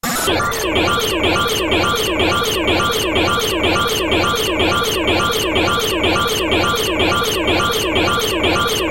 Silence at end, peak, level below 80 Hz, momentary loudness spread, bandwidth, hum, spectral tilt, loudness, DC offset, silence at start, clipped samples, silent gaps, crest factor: 0 s; -4 dBFS; -32 dBFS; 1 LU; 17 kHz; none; -3 dB/octave; -16 LUFS; under 0.1%; 0.05 s; under 0.1%; none; 14 dB